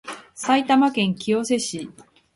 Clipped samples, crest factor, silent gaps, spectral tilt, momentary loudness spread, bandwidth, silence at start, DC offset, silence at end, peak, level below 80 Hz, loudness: under 0.1%; 16 dB; none; -4 dB/octave; 17 LU; 11.5 kHz; 0.05 s; under 0.1%; 0.45 s; -6 dBFS; -64 dBFS; -21 LUFS